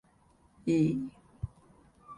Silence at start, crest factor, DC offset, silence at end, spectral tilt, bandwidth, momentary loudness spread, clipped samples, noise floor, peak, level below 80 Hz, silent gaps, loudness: 0.65 s; 18 dB; under 0.1%; 0 s; -8 dB/octave; 11 kHz; 16 LU; under 0.1%; -65 dBFS; -16 dBFS; -54 dBFS; none; -33 LUFS